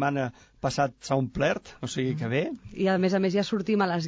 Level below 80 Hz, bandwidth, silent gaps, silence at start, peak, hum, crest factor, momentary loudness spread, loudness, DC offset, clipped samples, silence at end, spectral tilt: -54 dBFS; 8 kHz; none; 0 s; -12 dBFS; none; 14 dB; 9 LU; -28 LUFS; under 0.1%; under 0.1%; 0 s; -6 dB/octave